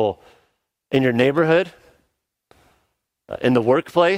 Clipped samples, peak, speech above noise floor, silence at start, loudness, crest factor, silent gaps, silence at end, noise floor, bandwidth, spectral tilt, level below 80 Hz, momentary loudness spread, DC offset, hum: under 0.1%; -2 dBFS; 54 dB; 0 s; -19 LUFS; 18 dB; none; 0 s; -72 dBFS; 15 kHz; -7 dB/octave; -60 dBFS; 13 LU; under 0.1%; none